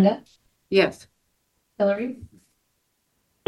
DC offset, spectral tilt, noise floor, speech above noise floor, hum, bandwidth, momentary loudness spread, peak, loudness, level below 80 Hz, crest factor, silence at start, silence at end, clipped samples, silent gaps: under 0.1%; -7 dB/octave; -72 dBFS; 50 dB; none; 12 kHz; 18 LU; -4 dBFS; -24 LUFS; -64 dBFS; 22 dB; 0 s; 1.25 s; under 0.1%; none